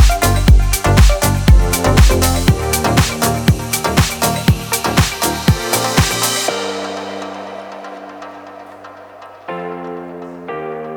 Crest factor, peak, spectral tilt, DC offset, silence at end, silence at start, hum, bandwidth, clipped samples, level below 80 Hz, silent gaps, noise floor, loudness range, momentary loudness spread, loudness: 14 dB; 0 dBFS; -4.5 dB/octave; under 0.1%; 0 s; 0 s; none; over 20 kHz; under 0.1%; -18 dBFS; none; -36 dBFS; 16 LU; 20 LU; -14 LUFS